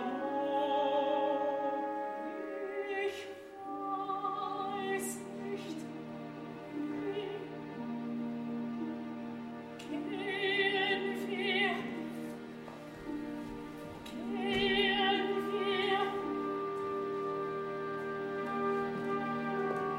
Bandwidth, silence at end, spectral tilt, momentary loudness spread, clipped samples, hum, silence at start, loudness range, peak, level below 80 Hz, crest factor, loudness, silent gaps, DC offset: 16 kHz; 0 s; -4.5 dB/octave; 13 LU; under 0.1%; none; 0 s; 7 LU; -18 dBFS; -68 dBFS; 18 dB; -36 LUFS; none; under 0.1%